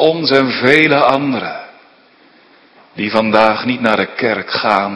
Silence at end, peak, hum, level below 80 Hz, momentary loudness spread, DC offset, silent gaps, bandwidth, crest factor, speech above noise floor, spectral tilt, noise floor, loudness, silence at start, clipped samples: 0 s; 0 dBFS; none; -54 dBFS; 10 LU; under 0.1%; none; 11 kHz; 14 dB; 34 dB; -6 dB/octave; -48 dBFS; -13 LUFS; 0 s; 0.3%